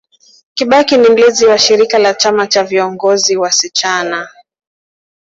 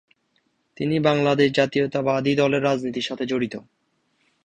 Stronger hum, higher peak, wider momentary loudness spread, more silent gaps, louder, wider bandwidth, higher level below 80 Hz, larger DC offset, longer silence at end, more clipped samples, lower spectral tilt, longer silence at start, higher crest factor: neither; first, 0 dBFS vs -4 dBFS; first, 11 LU vs 8 LU; neither; first, -10 LUFS vs -22 LUFS; second, 7.8 kHz vs 9.6 kHz; about the same, -56 dBFS vs -60 dBFS; neither; first, 1.05 s vs 0.85 s; neither; second, -1.5 dB/octave vs -6 dB/octave; second, 0.55 s vs 0.8 s; second, 12 dB vs 18 dB